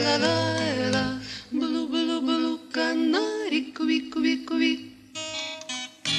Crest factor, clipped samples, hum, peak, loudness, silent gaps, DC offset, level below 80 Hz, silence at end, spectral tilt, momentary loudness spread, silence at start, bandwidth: 16 dB; under 0.1%; none; -10 dBFS; -26 LUFS; none; under 0.1%; -60 dBFS; 0 s; -4 dB/octave; 9 LU; 0 s; 11.5 kHz